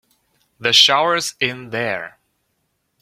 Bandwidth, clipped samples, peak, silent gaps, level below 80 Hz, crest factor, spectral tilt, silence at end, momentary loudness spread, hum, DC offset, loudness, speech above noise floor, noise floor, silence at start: 16.5 kHz; under 0.1%; 0 dBFS; none; -66 dBFS; 20 dB; -1.5 dB/octave; 0.95 s; 14 LU; none; under 0.1%; -16 LUFS; 52 dB; -70 dBFS; 0.6 s